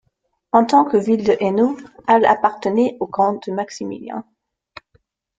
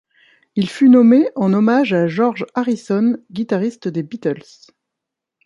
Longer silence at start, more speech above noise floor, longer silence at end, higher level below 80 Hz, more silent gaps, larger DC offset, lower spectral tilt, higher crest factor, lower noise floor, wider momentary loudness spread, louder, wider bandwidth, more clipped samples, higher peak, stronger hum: about the same, 0.55 s vs 0.55 s; second, 52 dB vs 67 dB; about the same, 1.15 s vs 1.05 s; first, -60 dBFS vs -66 dBFS; neither; neither; second, -6 dB/octave vs -7.5 dB/octave; about the same, 18 dB vs 14 dB; second, -70 dBFS vs -82 dBFS; about the same, 14 LU vs 14 LU; about the same, -18 LUFS vs -16 LUFS; second, 7.8 kHz vs 9.6 kHz; neither; about the same, 0 dBFS vs -2 dBFS; neither